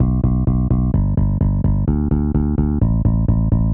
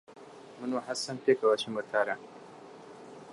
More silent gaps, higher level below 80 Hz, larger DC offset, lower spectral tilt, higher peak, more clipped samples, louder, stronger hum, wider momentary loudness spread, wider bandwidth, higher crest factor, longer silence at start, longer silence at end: neither; first, -20 dBFS vs -82 dBFS; neither; first, -14 dB/octave vs -3.5 dB/octave; first, -4 dBFS vs -14 dBFS; neither; first, -18 LUFS vs -31 LUFS; neither; second, 1 LU vs 23 LU; second, 2.3 kHz vs 11.5 kHz; second, 12 dB vs 20 dB; about the same, 0 s vs 0.1 s; about the same, 0 s vs 0 s